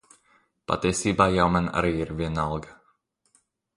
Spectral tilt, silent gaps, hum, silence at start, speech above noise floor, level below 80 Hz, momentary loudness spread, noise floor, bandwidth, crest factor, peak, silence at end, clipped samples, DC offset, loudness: -5.5 dB/octave; none; none; 0.7 s; 44 dB; -44 dBFS; 10 LU; -68 dBFS; 11.5 kHz; 24 dB; -4 dBFS; 1.05 s; under 0.1%; under 0.1%; -25 LUFS